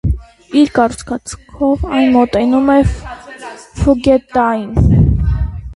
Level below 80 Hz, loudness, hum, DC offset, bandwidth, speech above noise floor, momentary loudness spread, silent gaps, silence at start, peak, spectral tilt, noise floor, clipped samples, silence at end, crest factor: -22 dBFS; -13 LUFS; none; under 0.1%; 11.5 kHz; 19 dB; 18 LU; none; 0.05 s; 0 dBFS; -7.5 dB/octave; -32 dBFS; under 0.1%; 0 s; 14 dB